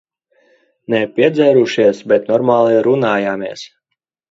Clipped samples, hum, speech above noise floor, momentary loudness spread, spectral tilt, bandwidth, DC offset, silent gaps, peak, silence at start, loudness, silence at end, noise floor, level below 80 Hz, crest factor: under 0.1%; none; 63 dB; 9 LU; -6.5 dB/octave; 7.8 kHz; under 0.1%; none; 0 dBFS; 0.9 s; -14 LUFS; 0.65 s; -76 dBFS; -62 dBFS; 14 dB